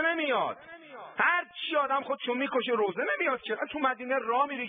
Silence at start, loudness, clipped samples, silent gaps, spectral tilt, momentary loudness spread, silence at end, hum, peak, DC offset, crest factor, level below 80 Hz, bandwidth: 0 s; -29 LUFS; under 0.1%; none; -7.5 dB/octave; 8 LU; 0 s; none; -12 dBFS; under 0.1%; 18 dB; -76 dBFS; 4.7 kHz